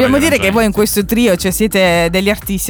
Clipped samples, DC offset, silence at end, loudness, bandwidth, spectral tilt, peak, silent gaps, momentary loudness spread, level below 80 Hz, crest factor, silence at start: under 0.1%; under 0.1%; 0 s; -12 LUFS; over 20 kHz; -4.5 dB/octave; 0 dBFS; none; 3 LU; -30 dBFS; 12 dB; 0 s